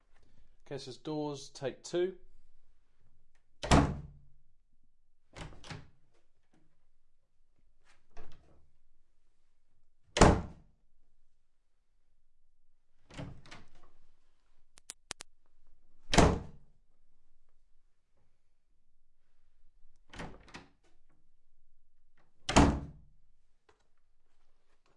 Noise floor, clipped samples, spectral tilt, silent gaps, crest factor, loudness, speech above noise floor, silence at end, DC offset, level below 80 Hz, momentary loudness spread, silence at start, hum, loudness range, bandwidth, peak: -66 dBFS; under 0.1%; -5 dB/octave; none; 30 dB; -30 LUFS; 28 dB; 2.05 s; under 0.1%; -44 dBFS; 26 LU; 0.2 s; none; 22 LU; 11.5 kHz; -8 dBFS